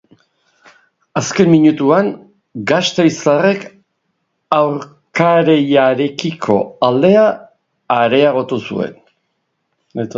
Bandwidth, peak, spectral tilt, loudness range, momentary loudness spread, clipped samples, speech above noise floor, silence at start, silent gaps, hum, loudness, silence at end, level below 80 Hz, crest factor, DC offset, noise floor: 7.8 kHz; 0 dBFS; -5.5 dB/octave; 2 LU; 14 LU; under 0.1%; 56 dB; 1.15 s; none; none; -14 LUFS; 0 s; -58 dBFS; 14 dB; under 0.1%; -69 dBFS